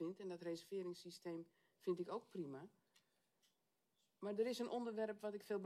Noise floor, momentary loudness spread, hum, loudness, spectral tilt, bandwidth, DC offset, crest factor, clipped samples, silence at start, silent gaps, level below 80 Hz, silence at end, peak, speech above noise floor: -87 dBFS; 10 LU; none; -48 LUFS; -5.5 dB/octave; 15 kHz; under 0.1%; 18 dB; under 0.1%; 0 s; none; under -90 dBFS; 0 s; -30 dBFS; 40 dB